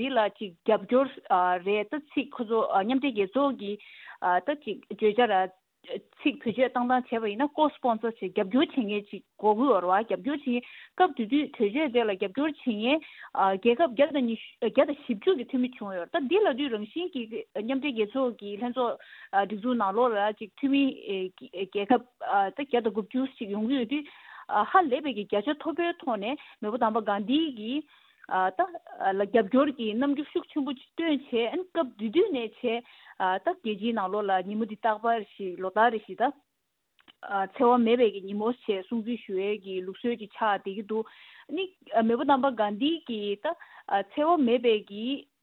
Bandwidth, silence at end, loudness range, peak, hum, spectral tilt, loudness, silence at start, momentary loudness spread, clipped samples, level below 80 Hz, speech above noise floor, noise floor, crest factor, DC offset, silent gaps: 4.3 kHz; 0.2 s; 3 LU; -8 dBFS; none; -8 dB/octave; -28 LUFS; 0 s; 10 LU; under 0.1%; -76 dBFS; 52 dB; -80 dBFS; 20 dB; under 0.1%; none